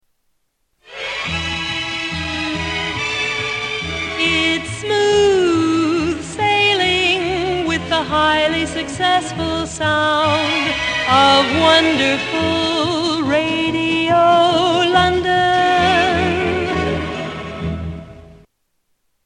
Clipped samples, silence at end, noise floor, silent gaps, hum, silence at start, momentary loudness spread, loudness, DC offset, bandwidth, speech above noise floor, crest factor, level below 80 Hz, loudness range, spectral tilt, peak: under 0.1%; 0.9 s; -67 dBFS; none; none; 0.9 s; 9 LU; -16 LUFS; under 0.1%; 11 kHz; 51 dB; 16 dB; -40 dBFS; 6 LU; -4 dB/octave; -2 dBFS